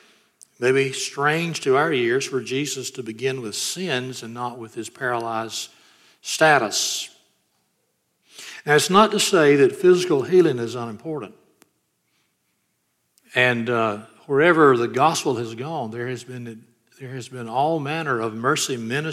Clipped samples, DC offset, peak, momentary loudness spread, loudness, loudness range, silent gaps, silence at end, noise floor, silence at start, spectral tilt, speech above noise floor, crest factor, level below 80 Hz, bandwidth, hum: under 0.1%; under 0.1%; -2 dBFS; 17 LU; -21 LUFS; 8 LU; none; 0 s; -71 dBFS; 0.6 s; -4 dB/octave; 50 dB; 20 dB; -72 dBFS; 15 kHz; none